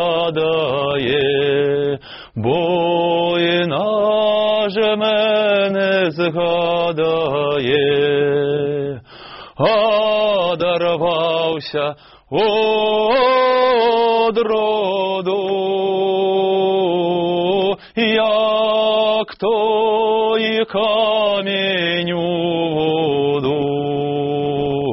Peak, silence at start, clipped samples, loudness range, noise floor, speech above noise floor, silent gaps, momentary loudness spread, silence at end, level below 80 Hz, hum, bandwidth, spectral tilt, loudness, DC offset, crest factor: -4 dBFS; 0 s; under 0.1%; 2 LU; -37 dBFS; 21 dB; none; 5 LU; 0 s; -54 dBFS; none; 5.8 kHz; -3 dB/octave; -17 LUFS; under 0.1%; 14 dB